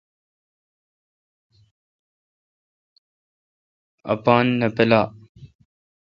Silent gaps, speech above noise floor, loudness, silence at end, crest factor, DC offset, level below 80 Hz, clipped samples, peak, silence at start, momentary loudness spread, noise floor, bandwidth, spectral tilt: 5.29-5.35 s; over 72 dB; -19 LUFS; 0.65 s; 24 dB; under 0.1%; -60 dBFS; under 0.1%; 0 dBFS; 4.05 s; 11 LU; under -90 dBFS; 6.6 kHz; -8.5 dB/octave